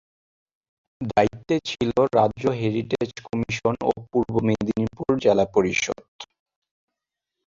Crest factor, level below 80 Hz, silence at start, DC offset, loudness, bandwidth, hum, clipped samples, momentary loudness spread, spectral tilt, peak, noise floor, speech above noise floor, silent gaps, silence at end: 20 dB; -52 dBFS; 1 s; under 0.1%; -23 LUFS; 7.8 kHz; none; under 0.1%; 9 LU; -6 dB/octave; -4 dBFS; -85 dBFS; 62 dB; 6.08-6.19 s; 1.2 s